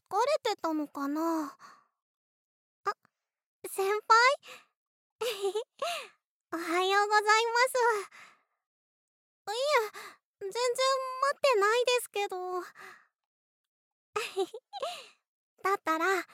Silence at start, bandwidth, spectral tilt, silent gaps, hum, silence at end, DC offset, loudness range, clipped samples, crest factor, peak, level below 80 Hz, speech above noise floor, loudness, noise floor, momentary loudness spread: 0.1 s; 16.5 kHz; -0.5 dB/octave; 2.02-2.84 s, 3.46-3.62 s, 4.77-5.19 s, 6.27-6.41 s, 8.66-9.45 s, 10.25-10.34 s, 13.26-14.13 s, 15.28-15.57 s; none; 0.1 s; under 0.1%; 8 LU; under 0.1%; 22 dB; -10 dBFS; under -90 dBFS; 46 dB; -29 LUFS; -75 dBFS; 17 LU